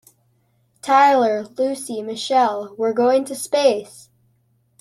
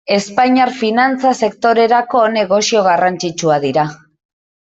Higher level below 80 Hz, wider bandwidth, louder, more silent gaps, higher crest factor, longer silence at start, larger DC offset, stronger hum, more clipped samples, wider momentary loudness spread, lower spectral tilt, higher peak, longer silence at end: second, -70 dBFS vs -58 dBFS; first, 13.5 kHz vs 8.2 kHz; second, -19 LUFS vs -14 LUFS; neither; first, 18 dB vs 12 dB; first, 0.85 s vs 0.1 s; neither; neither; neither; first, 13 LU vs 5 LU; about the same, -3 dB/octave vs -4 dB/octave; about the same, -2 dBFS vs -2 dBFS; about the same, 0.8 s vs 0.7 s